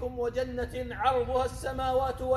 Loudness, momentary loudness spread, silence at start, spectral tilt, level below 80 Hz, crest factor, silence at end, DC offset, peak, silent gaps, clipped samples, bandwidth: -30 LUFS; 6 LU; 0 s; -5.5 dB/octave; -42 dBFS; 18 dB; 0 s; under 0.1%; -12 dBFS; none; under 0.1%; 13.5 kHz